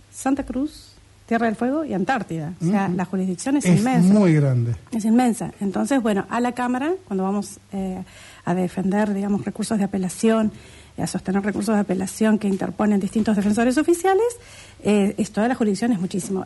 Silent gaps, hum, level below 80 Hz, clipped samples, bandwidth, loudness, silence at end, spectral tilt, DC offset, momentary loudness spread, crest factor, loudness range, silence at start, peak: none; none; -52 dBFS; under 0.1%; 11.5 kHz; -22 LUFS; 0 s; -6.5 dB/octave; under 0.1%; 9 LU; 14 dB; 5 LU; 0.15 s; -6 dBFS